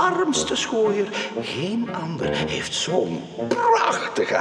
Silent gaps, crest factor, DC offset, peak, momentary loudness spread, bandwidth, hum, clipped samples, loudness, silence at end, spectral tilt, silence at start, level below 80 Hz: none; 16 dB; under 0.1%; -6 dBFS; 8 LU; 11.5 kHz; none; under 0.1%; -23 LUFS; 0 s; -3.5 dB/octave; 0 s; -54 dBFS